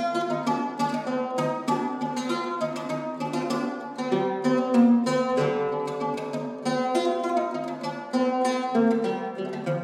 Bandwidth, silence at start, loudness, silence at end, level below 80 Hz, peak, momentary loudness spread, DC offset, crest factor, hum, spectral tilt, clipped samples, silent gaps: 12 kHz; 0 s; -26 LUFS; 0 s; -76 dBFS; -8 dBFS; 8 LU; under 0.1%; 18 dB; none; -6 dB/octave; under 0.1%; none